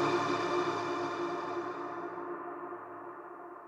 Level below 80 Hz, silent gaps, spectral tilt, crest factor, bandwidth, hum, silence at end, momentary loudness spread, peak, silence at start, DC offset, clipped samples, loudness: -76 dBFS; none; -5 dB/octave; 18 dB; 9.2 kHz; none; 0 s; 14 LU; -18 dBFS; 0 s; under 0.1%; under 0.1%; -36 LUFS